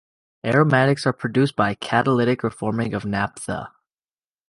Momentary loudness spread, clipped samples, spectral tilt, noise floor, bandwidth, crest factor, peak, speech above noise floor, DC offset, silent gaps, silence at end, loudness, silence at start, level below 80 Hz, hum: 13 LU; under 0.1%; -6.5 dB/octave; under -90 dBFS; 11.5 kHz; 18 dB; -4 dBFS; over 70 dB; under 0.1%; none; 0.8 s; -21 LUFS; 0.45 s; -54 dBFS; none